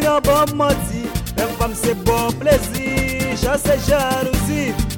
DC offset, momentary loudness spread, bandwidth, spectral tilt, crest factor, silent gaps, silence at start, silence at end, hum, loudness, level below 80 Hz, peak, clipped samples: under 0.1%; 6 LU; 17.5 kHz; -5 dB/octave; 16 dB; none; 0 s; 0 s; none; -18 LUFS; -28 dBFS; -2 dBFS; under 0.1%